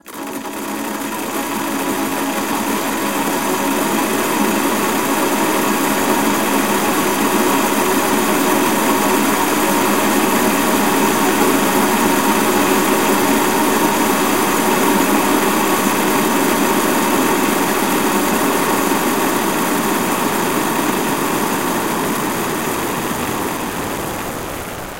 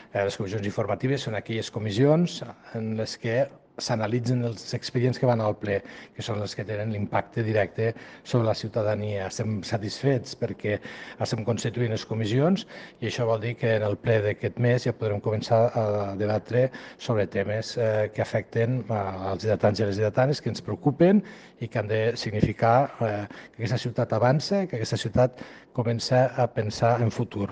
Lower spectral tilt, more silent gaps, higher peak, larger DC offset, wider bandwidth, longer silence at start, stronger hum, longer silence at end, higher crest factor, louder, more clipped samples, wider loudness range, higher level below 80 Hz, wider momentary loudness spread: second, -3 dB/octave vs -6.5 dB/octave; neither; first, -2 dBFS vs -8 dBFS; first, 2% vs under 0.1%; first, 16 kHz vs 9.4 kHz; about the same, 0 s vs 0 s; neither; about the same, 0 s vs 0 s; about the same, 14 dB vs 18 dB; first, -16 LUFS vs -26 LUFS; neither; about the same, 4 LU vs 3 LU; first, -46 dBFS vs -56 dBFS; about the same, 7 LU vs 9 LU